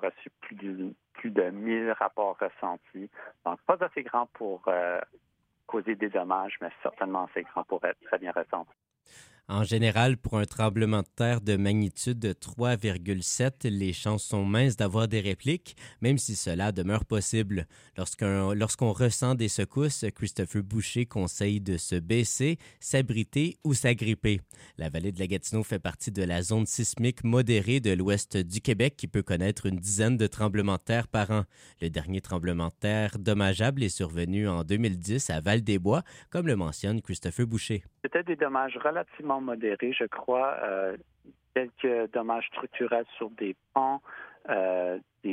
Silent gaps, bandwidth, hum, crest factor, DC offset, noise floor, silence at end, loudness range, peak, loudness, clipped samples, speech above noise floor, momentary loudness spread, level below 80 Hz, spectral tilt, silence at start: none; 16 kHz; none; 20 dB; under 0.1%; -57 dBFS; 0 s; 4 LU; -8 dBFS; -29 LUFS; under 0.1%; 28 dB; 9 LU; -52 dBFS; -5.5 dB/octave; 0 s